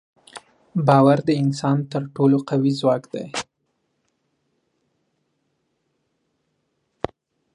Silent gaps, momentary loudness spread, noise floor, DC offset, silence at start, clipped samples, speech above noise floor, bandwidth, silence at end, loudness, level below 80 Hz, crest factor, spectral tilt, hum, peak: none; 18 LU; -72 dBFS; under 0.1%; 0.35 s; under 0.1%; 54 dB; 11 kHz; 4.15 s; -20 LUFS; -62 dBFS; 22 dB; -7 dB/octave; none; -2 dBFS